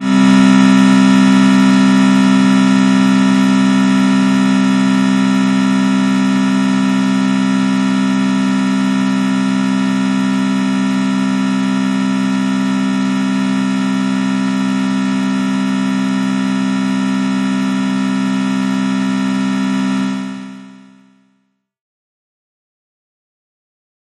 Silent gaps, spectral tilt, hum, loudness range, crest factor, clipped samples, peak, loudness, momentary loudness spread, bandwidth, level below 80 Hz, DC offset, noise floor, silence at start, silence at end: none; -6 dB/octave; none; 7 LU; 12 dB; under 0.1%; -2 dBFS; -13 LUFS; 7 LU; 11.5 kHz; -62 dBFS; under 0.1%; -64 dBFS; 0 s; 3.3 s